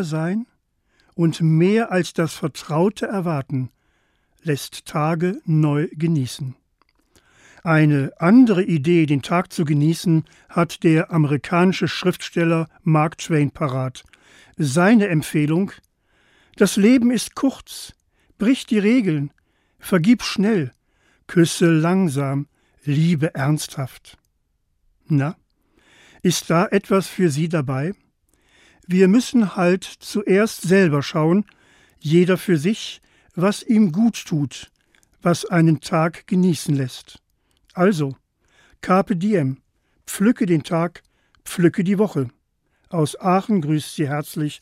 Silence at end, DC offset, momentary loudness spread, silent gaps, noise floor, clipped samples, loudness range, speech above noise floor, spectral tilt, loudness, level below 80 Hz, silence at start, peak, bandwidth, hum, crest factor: 0.05 s; under 0.1%; 12 LU; none; -68 dBFS; under 0.1%; 5 LU; 50 dB; -6.5 dB/octave; -19 LUFS; -60 dBFS; 0 s; -4 dBFS; 15.5 kHz; none; 16 dB